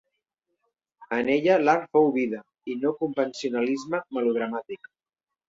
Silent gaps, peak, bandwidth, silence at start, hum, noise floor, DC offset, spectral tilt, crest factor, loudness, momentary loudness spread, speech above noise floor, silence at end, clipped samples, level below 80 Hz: none; -8 dBFS; 7.8 kHz; 1 s; none; -89 dBFS; under 0.1%; -5.5 dB/octave; 20 dB; -25 LUFS; 14 LU; 65 dB; 0.75 s; under 0.1%; -72 dBFS